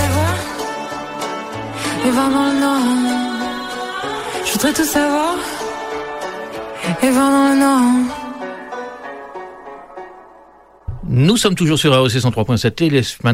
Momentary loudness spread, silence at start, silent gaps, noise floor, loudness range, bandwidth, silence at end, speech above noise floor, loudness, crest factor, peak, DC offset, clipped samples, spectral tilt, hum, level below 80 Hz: 18 LU; 0 s; none; -46 dBFS; 4 LU; 16 kHz; 0 s; 31 dB; -17 LUFS; 16 dB; -2 dBFS; under 0.1%; under 0.1%; -5 dB/octave; none; -44 dBFS